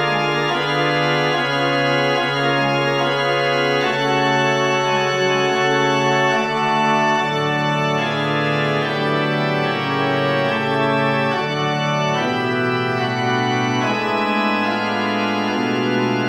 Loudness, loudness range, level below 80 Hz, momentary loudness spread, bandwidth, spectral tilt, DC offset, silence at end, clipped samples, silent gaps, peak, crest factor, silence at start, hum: -18 LUFS; 2 LU; -60 dBFS; 3 LU; 16 kHz; -5 dB/octave; 0.1%; 0 s; under 0.1%; none; -6 dBFS; 14 dB; 0 s; none